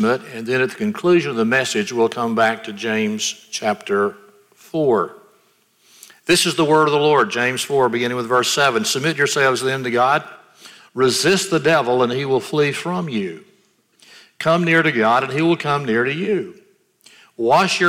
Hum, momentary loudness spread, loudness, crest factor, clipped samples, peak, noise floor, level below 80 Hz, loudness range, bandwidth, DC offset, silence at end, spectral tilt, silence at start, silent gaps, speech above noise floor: none; 9 LU; -18 LUFS; 16 dB; under 0.1%; -4 dBFS; -59 dBFS; -64 dBFS; 4 LU; 16 kHz; under 0.1%; 0 s; -4 dB/octave; 0 s; none; 41 dB